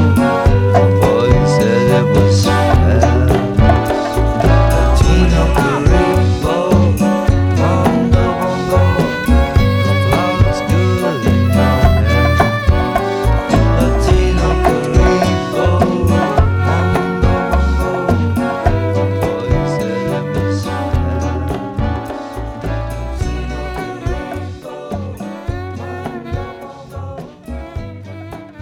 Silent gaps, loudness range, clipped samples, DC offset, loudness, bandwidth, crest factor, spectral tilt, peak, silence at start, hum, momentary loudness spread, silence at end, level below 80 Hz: none; 12 LU; under 0.1%; under 0.1%; -14 LUFS; 16 kHz; 14 dB; -7 dB/octave; 0 dBFS; 0 s; none; 14 LU; 0 s; -20 dBFS